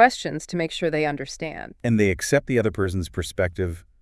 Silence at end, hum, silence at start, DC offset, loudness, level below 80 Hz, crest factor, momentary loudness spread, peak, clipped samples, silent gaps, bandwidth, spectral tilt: 0.2 s; none; 0 s; under 0.1%; -24 LUFS; -46 dBFS; 20 dB; 10 LU; -2 dBFS; under 0.1%; none; 12 kHz; -5 dB/octave